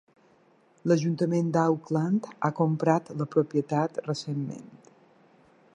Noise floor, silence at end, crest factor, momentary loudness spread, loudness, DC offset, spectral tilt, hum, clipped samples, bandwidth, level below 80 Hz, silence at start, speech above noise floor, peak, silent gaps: -62 dBFS; 1 s; 20 dB; 9 LU; -27 LUFS; under 0.1%; -7.5 dB/octave; none; under 0.1%; 9.8 kHz; -74 dBFS; 0.85 s; 36 dB; -8 dBFS; none